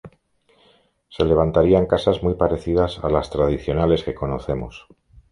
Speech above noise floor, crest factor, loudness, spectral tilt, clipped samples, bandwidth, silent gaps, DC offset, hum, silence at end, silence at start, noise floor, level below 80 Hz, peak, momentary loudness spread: 41 dB; 18 dB; -20 LUFS; -8 dB/octave; under 0.1%; 10.5 kHz; none; under 0.1%; none; 0.5 s; 0.05 s; -60 dBFS; -36 dBFS; -2 dBFS; 10 LU